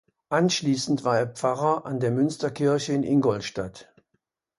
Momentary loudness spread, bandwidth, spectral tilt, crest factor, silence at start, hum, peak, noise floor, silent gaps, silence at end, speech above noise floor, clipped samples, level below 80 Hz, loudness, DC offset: 6 LU; 11.5 kHz; -5.5 dB/octave; 16 dB; 0.3 s; none; -8 dBFS; -76 dBFS; none; 0.75 s; 51 dB; under 0.1%; -62 dBFS; -25 LUFS; under 0.1%